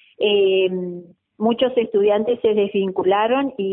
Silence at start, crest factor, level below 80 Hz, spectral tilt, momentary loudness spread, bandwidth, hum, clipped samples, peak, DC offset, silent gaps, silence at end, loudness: 0.2 s; 14 dB; -62 dBFS; -10.5 dB/octave; 6 LU; 3.8 kHz; none; under 0.1%; -6 dBFS; under 0.1%; none; 0 s; -19 LUFS